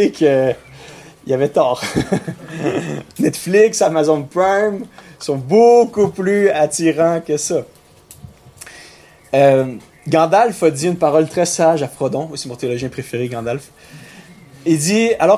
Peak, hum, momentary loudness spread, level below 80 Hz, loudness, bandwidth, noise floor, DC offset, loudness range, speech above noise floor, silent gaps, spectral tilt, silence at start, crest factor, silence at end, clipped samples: -2 dBFS; none; 13 LU; -52 dBFS; -16 LUFS; 16 kHz; -44 dBFS; under 0.1%; 5 LU; 28 dB; none; -5 dB/octave; 0 s; 14 dB; 0 s; under 0.1%